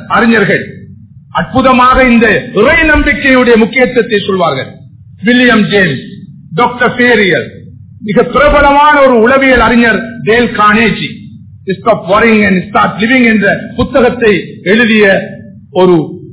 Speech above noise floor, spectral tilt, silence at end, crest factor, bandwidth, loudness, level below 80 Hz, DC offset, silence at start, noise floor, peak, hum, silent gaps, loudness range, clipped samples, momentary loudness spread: 26 dB; -9 dB/octave; 0 s; 8 dB; 4 kHz; -7 LUFS; -28 dBFS; under 0.1%; 0 s; -33 dBFS; 0 dBFS; none; none; 3 LU; 3%; 11 LU